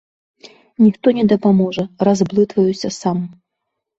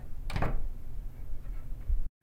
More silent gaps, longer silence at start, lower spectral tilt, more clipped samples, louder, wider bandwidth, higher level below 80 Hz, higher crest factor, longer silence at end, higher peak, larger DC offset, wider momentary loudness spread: neither; first, 0.8 s vs 0 s; about the same, -7 dB/octave vs -6.5 dB/octave; neither; first, -16 LUFS vs -40 LUFS; second, 8 kHz vs 9 kHz; second, -56 dBFS vs -34 dBFS; about the same, 14 dB vs 14 dB; first, 0.65 s vs 0.15 s; first, -2 dBFS vs -16 dBFS; neither; second, 8 LU vs 11 LU